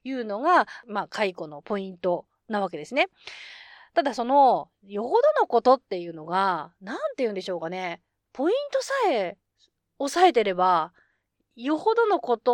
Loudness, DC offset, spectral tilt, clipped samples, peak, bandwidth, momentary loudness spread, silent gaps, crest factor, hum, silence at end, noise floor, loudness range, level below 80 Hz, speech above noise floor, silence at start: -25 LUFS; under 0.1%; -4.5 dB/octave; under 0.1%; -6 dBFS; 16 kHz; 14 LU; none; 18 dB; none; 0 s; -73 dBFS; 5 LU; -74 dBFS; 49 dB; 0.05 s